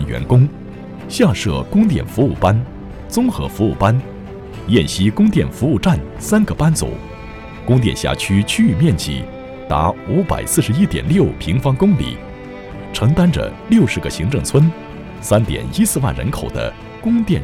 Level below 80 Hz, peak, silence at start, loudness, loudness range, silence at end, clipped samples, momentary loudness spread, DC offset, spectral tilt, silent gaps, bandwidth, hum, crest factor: -32 dBFS; -2 dBFS; 0 s; -16 LUFS; 1 LU; 0 s; under 0.1%; 16 LU; under 0.1%; -6 dB/octave; none; 16.5 kHz; none; 14 dB